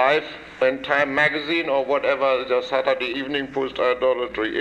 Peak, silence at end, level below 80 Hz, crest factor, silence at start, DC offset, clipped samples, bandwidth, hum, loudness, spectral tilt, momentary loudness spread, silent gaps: -6 dBFS; 0 s; -56 dBFS; 16 dB; 0 s; under 0.1%; under 0.1%; 8.4 kHz; none; -22 LUFS; -5 dB/octave; 5 LU; none